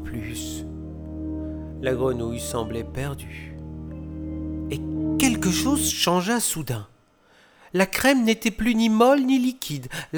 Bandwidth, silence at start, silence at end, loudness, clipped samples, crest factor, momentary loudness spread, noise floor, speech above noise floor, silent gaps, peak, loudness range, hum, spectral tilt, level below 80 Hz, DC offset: over 20 kHz; 0 s; 0 s; -24 LUFS; under 0.1%; 20 dB; 17 LU; -58 dBFS; 35 dB; none; -4 dBFS; 8 LU; none; -4 dB/octave; -42 dBFS; under 0.1%